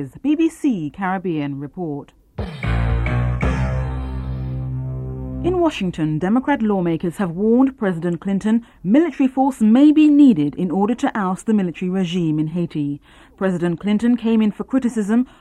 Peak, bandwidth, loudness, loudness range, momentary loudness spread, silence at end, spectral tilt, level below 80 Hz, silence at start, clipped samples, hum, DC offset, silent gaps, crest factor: -4 dBFS; 11.5 kHz; -19 LUFS; 8 LU; 13 LU; 0.15 s; -8 dB/octave; -32 dBFS; 0 s; under 0.1%; none; under 0.1%; none; 14 dB